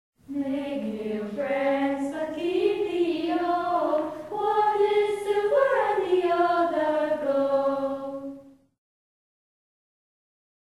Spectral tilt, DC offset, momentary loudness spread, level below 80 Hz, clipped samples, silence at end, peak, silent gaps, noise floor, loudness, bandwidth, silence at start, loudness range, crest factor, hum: -5.5 dB/octave; under 0.1%; 9 LU; -66 dBFS; under 0.1%; 2.25 s; -10 dBFS; none; -45 dBFS; -25 LUFS; 13 kHz; 0.3 s; 6 LU; 16 dB; none